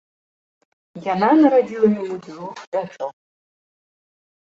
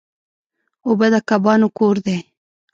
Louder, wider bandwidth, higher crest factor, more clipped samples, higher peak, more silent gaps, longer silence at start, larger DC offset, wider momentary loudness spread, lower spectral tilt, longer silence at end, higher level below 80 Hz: about the same, -18 LUFS vs -17 LUFS; about the same, 7.6 kHz vs 7.6 kHz; about the same, 18 dB vs 16 dB; neither; about the same, -2 dBFS vs -2 dBFS; first, 2.67-2.72 s vs none; about the same, 0.95 s vs 0.85 s; neither; first, 18 LU vs 10 LU; about the same, -7.5 dB/octave vs -6.5 dB/octave; first, 1.5 s vs 0.5 s; about the same, -68 dBFS vs -64 dBFS